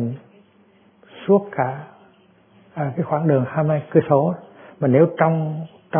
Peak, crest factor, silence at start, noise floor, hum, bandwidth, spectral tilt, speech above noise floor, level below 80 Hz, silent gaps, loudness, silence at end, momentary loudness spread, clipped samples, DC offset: -2 dBFS; 20 dB; 0 s; -55 dBFS; none; 3.6 kHz; -13 dB/octave; 36 dB; -66 dBFS; none; -20 LUFS; 0 s; 16 LU; under 0.1%; under 0.1%